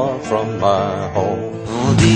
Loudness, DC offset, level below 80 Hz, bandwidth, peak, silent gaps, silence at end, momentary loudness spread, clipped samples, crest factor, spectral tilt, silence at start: -18 LUFS; under 0.1%; -40 dBFS; 10 kHz; -2 dBFS; none; 0 s; 6 LU; under 0.1%; 16 dB; -6 dB/octave; 0 s